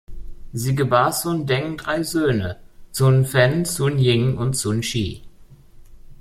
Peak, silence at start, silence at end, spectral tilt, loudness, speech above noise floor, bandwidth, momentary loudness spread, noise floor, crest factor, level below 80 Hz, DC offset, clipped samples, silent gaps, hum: -2 dBFS; 0.1 s; 0.05 s; -5.5 dB/octave; -20 LUFS; 26 dB; 15 kHz; 12 LU; -45 dBFS; 18 dB; -42 dBFS; under 0.1%; under 0.1%; none; none